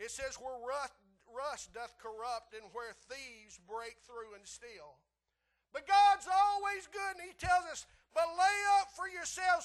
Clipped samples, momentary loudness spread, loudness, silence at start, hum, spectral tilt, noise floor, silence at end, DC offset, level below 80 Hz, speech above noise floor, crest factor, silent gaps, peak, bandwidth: under 0.1%; 21 LU; -34 LUFS; 0 s; none; -1 dB/octave; -84 dBFS; 0 s; under 0.1%; -66 dBFS; 48 dB; 18 dB; none; -18 dBFS; 12.5 kHz